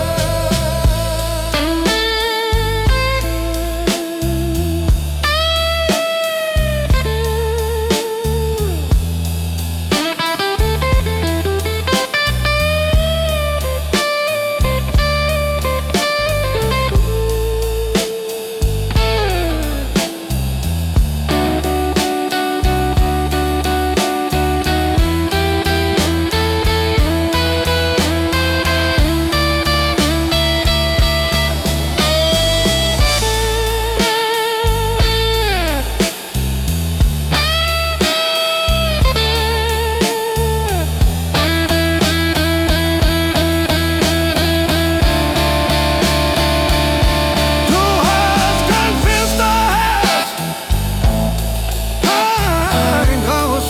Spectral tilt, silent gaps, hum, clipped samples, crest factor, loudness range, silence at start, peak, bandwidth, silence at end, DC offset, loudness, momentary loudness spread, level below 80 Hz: -4.5 dB/octave; none; none; under 0.1%; 12 dB; 4 LU; 0 s; -4 dBFS; 18 kHz; 0 s; under 0.1%; -16 LUFS; 5 LU; -20 dBFS